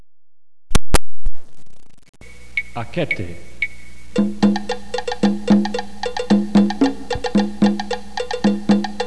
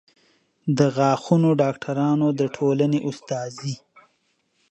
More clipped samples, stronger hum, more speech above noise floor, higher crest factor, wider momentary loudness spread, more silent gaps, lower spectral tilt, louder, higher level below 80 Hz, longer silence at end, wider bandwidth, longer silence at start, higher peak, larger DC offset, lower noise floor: neither; neither; second, 19 dB vs 48 dB; second, 10 dB vs 18 dB; about the same, 10 LU vs 12 LU; first, 2.09-2.13 s vs none; second, -5.5 dB/octave vs -7 dB/octave; about the same, -20 LUFS vs -22 LUFS; first, -32 dBFS vs -64 dBFS; second, 0 s vs 0.95 s; first, 11 kHz vs 8.6 kHz; second, 0 s vs 0.65 s; about the same, -6 dBFS vs -4 dBFS; first, 4% vs under 0.1%; second, -40 dBFS vs -69 dBFS